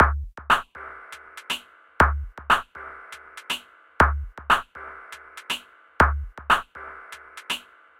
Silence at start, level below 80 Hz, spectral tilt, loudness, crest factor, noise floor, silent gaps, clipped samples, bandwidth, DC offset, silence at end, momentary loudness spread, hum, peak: 0 s; -34 dBFS; -4 dB/octave; -24 LUFS; 24 dB; -43 dBFS; none; under 0.1%; 16.5 kHz; under 0.1%; 0.4 s; 20 LU; none; -2 dBFS